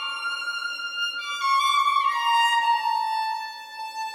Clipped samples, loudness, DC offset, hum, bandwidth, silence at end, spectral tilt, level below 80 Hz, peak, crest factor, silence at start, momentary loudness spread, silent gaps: under 0.1%; -23 LUFS; under 0.1%; none; 16 kHz; 0 s; 3.5 dB/octave; under -90 dBFS; -10 dBFS; 14 dB; 0 s; 12 LU; none